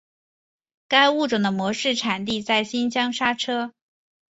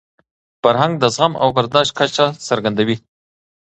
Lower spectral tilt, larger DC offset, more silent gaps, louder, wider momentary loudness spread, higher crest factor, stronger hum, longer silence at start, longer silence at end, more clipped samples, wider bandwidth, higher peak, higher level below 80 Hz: about the same, -3.5 dB/octave vs -4.5 dB/octave; neither; neither; second, -22 LUFS vs -16 LUFS; first, 8 LU vs 4 LU; about the same, 20 dB vs 18 dB; neither; first, 0.9 s vs 0.65 s; about the same, 0.6 s vs 0.7 s; neither; second, 8 kHz vs 9 kHz; second, -4 dBFS vs 0 dBFS; second, -64 dBFS vs -54 dBFS